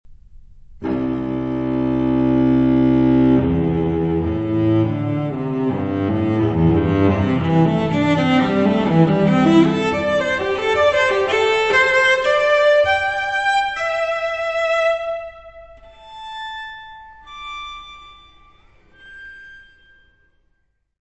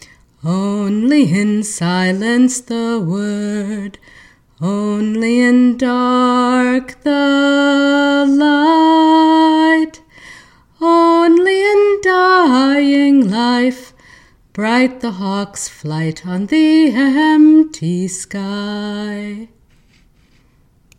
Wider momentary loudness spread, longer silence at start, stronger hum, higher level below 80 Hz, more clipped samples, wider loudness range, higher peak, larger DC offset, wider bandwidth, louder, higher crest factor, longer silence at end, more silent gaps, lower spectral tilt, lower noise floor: first, 17 LU vs 12 LU; second, 0.1 s vs 0.45 s; neither; first, -42 dBFS vs -54 dBFS; neither; first, 18 LU vs 6 LU; about the same, -2 dBFS vs 0 dBFS; first, 0.1% vs under 0.1%; second, 8.4 kHz vs 12 kHz; second, -17 LUFS vs -13 LUFS; about the same, 16 dB vs 14 dB; second, 1.4 s vs 1.55 s; neither; first, -7 dB/octave vs -5 dB/octave; first, -66 dBFS vs -52 dBFS